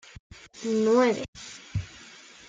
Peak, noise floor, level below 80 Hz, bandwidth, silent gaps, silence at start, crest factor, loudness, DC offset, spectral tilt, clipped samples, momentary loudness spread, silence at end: -10 dBFS; -49 dBFS; -54 dBFS; 9.2 kHz; 1.28-1.33 s; 0.55 s; 18 dB; -26 LUFS; under 0.1%; -5.5 dB/octave; under 0.1%; 24 LU; 0.45 s